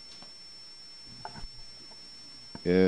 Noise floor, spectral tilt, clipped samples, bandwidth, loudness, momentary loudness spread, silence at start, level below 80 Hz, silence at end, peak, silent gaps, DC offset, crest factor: -49 dBFS; -6.5 dB/octave; under 0.1%; 10 kHz; -40 LUFS; 8 LU; 0 s; -54 dBFS; 0 s; -10 dBFS; none; 0.2%; 22 dB